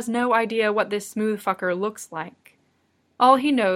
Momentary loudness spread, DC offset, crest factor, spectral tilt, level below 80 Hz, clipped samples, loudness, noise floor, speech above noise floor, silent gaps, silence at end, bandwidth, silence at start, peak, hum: 16 LU; under 0.1%; 20 dB; -4.5 dB/octave; -70 dBFS; under 0.1%; -22 LUFS; -67 dBFS; 45 dB; none; 0 s; 16 kHz; 0 s; -2 dBFS; none